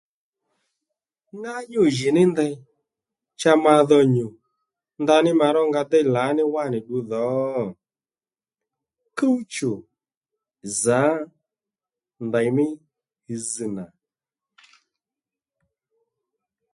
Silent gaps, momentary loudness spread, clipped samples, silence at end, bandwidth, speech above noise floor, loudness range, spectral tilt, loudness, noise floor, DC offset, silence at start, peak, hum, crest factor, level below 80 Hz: 10.17-10.21 s; 18 LU; under 0.1%; 2.85 s; 11.5 kHz; over 70 dB; 10 LU; -5.5 dB/octave; -21 LUFS; under -90 dBFS; under 0.1%; 1.35 s; -2 dBFS; none; 20 dB; -68 dBFS